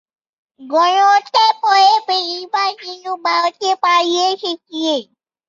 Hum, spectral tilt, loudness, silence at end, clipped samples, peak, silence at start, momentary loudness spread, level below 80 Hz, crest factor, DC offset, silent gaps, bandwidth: none; -0.5 dB/octave; -15 LUFS; 0.45 s; under 0.1%; -2 dBFS; 0.6 s; 11 LU; -74 dBFS; 14 dB; under 0.1%; none; 7.6 kHz